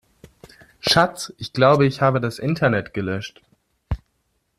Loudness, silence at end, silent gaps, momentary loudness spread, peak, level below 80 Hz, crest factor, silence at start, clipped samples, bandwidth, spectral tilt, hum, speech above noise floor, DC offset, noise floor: -20 LUFS; 0.6 s; none; 16 LU; -2 dBFS; -42 dBFS; 20 dB; 0.85 s; under 0.1%; 14 kHz; -5.5 dB/octave; none; 50 dB; under 0.1%; -70 dBFS